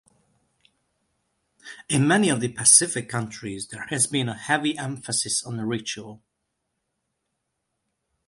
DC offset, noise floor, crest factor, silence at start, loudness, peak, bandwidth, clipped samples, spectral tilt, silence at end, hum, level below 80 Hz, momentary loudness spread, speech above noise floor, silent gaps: under 0.1%; -79 dBFS; 26 dB; 1.65 s; -22 LUFS; -2 dBFS; 11.5 kHz; under 0.1%; -3 dB/octave; 2.1 s; none; -64 dBFS; 18 LU; 55 dB; none